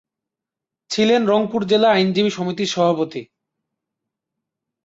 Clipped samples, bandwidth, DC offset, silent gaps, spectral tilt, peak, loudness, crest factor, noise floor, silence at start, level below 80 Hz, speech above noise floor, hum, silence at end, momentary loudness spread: under 0.1%; 8 kHz; under 0.1%; none; -5 dB/octave; -6 dBFS; -18 LUFS; 16 dB; -86 dBFS; 0.9 s; -64 dBFS; 69 dB; none; 1.6 s; 10 LU